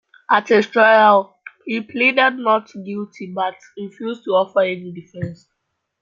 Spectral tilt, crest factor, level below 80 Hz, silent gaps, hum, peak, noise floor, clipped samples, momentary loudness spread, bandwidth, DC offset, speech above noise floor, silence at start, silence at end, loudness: -5.5 dB/octave; 18 dB; -66 dBFS; none; none; -2 dBFS; -75 dBFS; under 0.1%; 18 LU; 7.4 kHz; under 0.1%; 57 dB; 0.3 s; 0.65 s; -16 LUFS